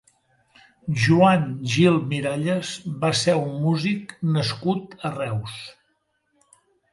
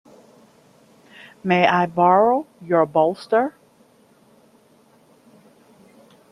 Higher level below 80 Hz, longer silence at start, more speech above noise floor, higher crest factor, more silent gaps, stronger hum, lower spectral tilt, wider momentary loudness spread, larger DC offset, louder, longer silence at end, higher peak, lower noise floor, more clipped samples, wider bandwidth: first, -60 dBFS vs -66 dBFS; second, 0.85 s vs 1.45 s; first, 49 dB vs 37 dB; about the same, 18 dB vs 20 dB; neither; neither; about the same, -6 dB/octave vs -7 dB/octave; first, 13 LU vs 8 LU; neither; second, -22 LUFS vs -19 LUFS; second, 1.2 s vs 2.8 s; about the same, -4 dBFS vs -2 dBFS; first, -70 dBFS vs -55 dBFS; neither; about the same, 11.5 kHz vs 12 kHz